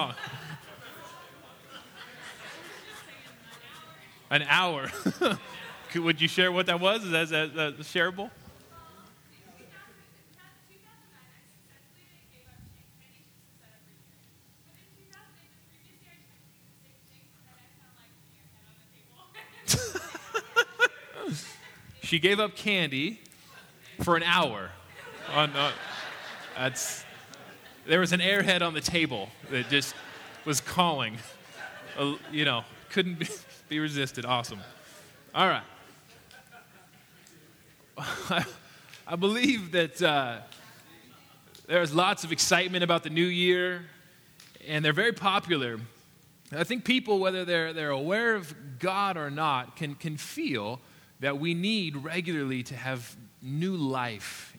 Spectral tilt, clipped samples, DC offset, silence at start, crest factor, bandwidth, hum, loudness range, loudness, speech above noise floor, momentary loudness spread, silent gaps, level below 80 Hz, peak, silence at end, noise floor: -3.5 dB/octave; under 0.1%; under 0.1%; 0 s; 26 dB; over 20 kHz; none; 8 LU; -28 LUFS; 31 dB; 22 LU; none; -66 dBFS; -6 dBFS; 0 s; -60 dBFS